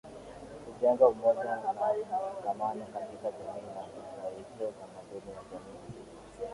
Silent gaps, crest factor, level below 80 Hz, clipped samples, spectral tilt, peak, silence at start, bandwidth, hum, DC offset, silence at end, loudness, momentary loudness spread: none; 24 dB; -66 dBFS; under 0.1%; -6 dB/octave; -10 dBFS; 0.05 s; 11.5 kHz; none; under 0.1%; 0 s; -32 LUFS; 22 LU